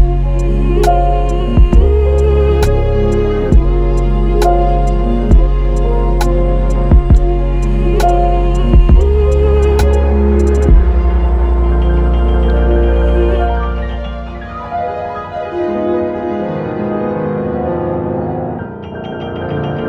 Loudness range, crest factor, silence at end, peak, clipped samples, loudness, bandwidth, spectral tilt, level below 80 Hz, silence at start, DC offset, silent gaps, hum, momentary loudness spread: 7 LU; 10 dB; 0 s; 0 dBFS; under 0.1%; -14 LUFS; 11.5 kHz; -8 dB/octave; -12 dBFS; 0 s; under 0.1%; none; none; 10 LU